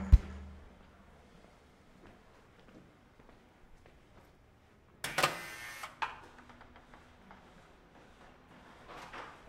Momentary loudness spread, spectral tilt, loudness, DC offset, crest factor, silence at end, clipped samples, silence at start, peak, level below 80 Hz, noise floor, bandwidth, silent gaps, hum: 29 LU; -4.5 dB/octave; -37 LUFS; under 0.1%; 30 dB; 0.1 s; under 0.1%; 0 s; -8 dBFS; -40 dBFS; -63 dBFS; 16 kHz; none; none